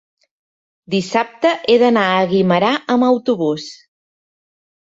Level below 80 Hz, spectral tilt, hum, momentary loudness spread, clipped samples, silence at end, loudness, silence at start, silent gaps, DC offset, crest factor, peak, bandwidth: -62 dBFS; -6 dB/octave; none; 9 LU; under 0.1%; 1.15 s; -16 LUFS; 0.9 s; none; under 0.1%; 16 dB; -2 dBFS; 7.8 kHz